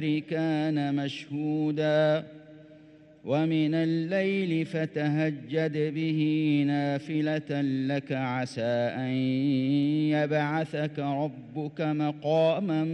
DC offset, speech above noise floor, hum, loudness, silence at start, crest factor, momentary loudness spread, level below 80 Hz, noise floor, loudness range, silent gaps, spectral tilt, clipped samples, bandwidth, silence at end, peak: under 0.1%; 26 dB; none; -28 LUFS; 0 s; 12 dB; 6 LU; -74 dBFS; -53 dBFS; 1 LU; none; -8 dB/octave; under 0.1%; 8.8 kHz; 0 s; -14 dBFS